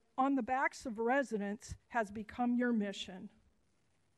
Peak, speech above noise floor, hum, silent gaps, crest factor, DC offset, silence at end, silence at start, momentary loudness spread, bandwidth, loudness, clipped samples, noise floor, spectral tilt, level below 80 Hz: -20 dBFS; 41 dB; none; none; 16 dB; under 0.1%; 0.9 s; 0.15 s; 13 LU; 12 kHz; -36 LUFS; under 0.1%; -77 dBFS; -5 dB/octave; -64 dBFS